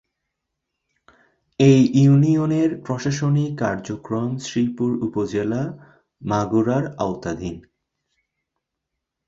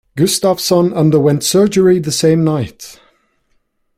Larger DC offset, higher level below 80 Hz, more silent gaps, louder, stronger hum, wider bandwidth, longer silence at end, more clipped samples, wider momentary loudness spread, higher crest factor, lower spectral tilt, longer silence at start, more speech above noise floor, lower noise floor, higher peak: neither; about the same, -54 dBFS vs -50 dBFS; neither; second, -20 LUFS vs -12 LUFS; neither; second, 7.8 kHz vs 16 kHz; first, 1.7 s vs 1.05 s; neither; first, 15 LU vs 10 LU; first, 18 dB vs 12 dB; first, -7.5 dB/octave vs -5.5 dB/octave; first, 1.6 s vs 0.15 s; first, 62 dB vs 49 dB; first, -81 dBFS vs -61 dBFS; about the same, -4 dBFS vs -2 dBFS